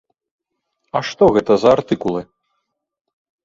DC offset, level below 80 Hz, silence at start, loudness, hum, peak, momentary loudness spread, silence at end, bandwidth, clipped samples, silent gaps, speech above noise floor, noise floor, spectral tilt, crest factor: under 0.1%; -50 dBFS; 0.95 s; -16 LUFS; none; -2 dBFS; 11 LU; 1.2 s; 7.6 kHz; under 0.1%; none; 59 dB; -74 dBFS; -6.5 dB/octave; 18 dB